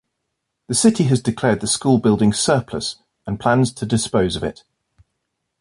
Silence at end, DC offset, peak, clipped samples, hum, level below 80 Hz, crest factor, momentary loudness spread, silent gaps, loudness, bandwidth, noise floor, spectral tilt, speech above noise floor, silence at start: 1.1 s; under 0.1%; -2 dBFS; under 0.1%; none; -46 dBFS; 16 dB; 11 LU; none; -18 LUFS; 11.5 kHz; -76 dBFS; -5 dB/octave; 59 dB; 0.7 s